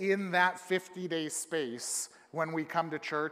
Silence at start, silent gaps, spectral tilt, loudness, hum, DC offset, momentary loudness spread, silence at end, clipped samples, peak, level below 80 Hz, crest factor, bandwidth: 0 s; none; -3.5 dB/octave; -33 LUFS; none; under 0.1%; 7 LU; 0 s; under 0.1%; -12 dBFS; -88 dBFS; 20 dB; 15.5 kHz